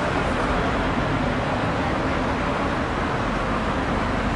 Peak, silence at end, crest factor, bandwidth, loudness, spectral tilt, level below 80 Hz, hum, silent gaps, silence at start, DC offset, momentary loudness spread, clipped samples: -10 dBFS; 0 s; 12 dB; 11 kHz; -23 LUFS; -6 dB/octave; -32 dBFS; none; none; 0 s; under 0.1%; 1 LU; under 0.1%